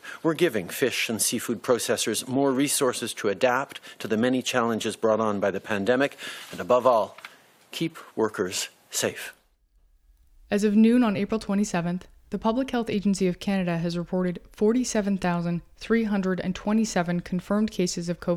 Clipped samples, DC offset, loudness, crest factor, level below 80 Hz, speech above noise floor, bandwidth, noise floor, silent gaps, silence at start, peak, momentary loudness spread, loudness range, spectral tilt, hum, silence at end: under 0.1%; under 0.1%; -25 LUFS; 18 dB; -54 dBFS; 38 dB; 16 kHz; -63 dBFS; none; 0.05 s; -6 dBFS; 9 LU; 3 LU; -4.5 dB/octave; none; 0 s